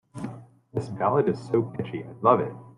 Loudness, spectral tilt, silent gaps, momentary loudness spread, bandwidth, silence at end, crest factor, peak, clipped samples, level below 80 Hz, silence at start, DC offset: -26 LUFS; -8.5 dB/octave; none; 15 LU; 11 kHz; 0.05 s; 22 dB; -4 dBFS; under 0.1%; -64 dBFS; 0.15 s; under 0.1%